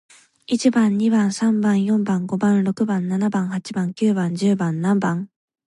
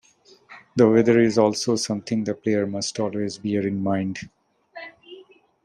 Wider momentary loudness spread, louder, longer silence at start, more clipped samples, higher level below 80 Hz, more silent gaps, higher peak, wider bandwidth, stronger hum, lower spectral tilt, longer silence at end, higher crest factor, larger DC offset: second, 7 LU vs 22 LU; about the same, -20 LUFS vs -22 LUFS; about the same, 0.5 s vs 0.5 s; neither; about the same, -66 dBFS vs -62 dBFS; neither; about the same, -6 dBFS vs -4 dBFS; about the same, 11.5 kHz vs 11 kHz; neither; about the same, -6.5 dB/octave vs -5.5 dB/octave; about the same, 0.4 s vs 0.45 s; second, 14 dB vs 20 dB; neither